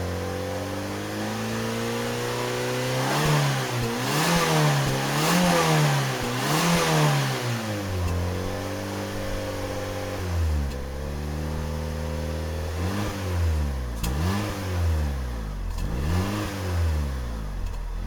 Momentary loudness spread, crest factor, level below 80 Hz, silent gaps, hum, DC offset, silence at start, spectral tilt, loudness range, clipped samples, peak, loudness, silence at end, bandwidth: 10 LU; 18 dB; -36 dBFS; none; none; under 0.1%; 0 s; -5 dB/octave; 8 LU; under 0.1%; -8 dBFS; -26 LUFS; 0 s; over 20 kHz